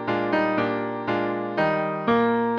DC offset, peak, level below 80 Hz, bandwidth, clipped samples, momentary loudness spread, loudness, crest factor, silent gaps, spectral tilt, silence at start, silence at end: under 0.1%; -10 dBFS; -60 dBFS; 6.6 kHz; under 0.1%; 5 LU; -24 LUFS; 14 dB; none; -8 dB/octave; 0 s; 0 s